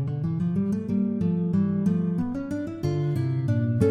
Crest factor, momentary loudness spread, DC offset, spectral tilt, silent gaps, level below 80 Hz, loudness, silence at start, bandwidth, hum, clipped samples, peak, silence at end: 16 dB; 5 LU; under 0.1%; -10 dB/octave; none; -54 dBFS; -26 LUFS; 0 s; 10 kHz; none; under 0.1%; -8 dBFS; 0 s